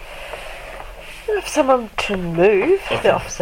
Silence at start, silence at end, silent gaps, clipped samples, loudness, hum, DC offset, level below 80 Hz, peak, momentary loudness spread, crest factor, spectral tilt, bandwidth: 0 s; 0 s; none; under 0.1%; -18 LUFS; none; under 0.1%; -40 dBFS; 0 dBFS; 18 LU; 20 dB; -4.5 dB/octave; 16.5 kHz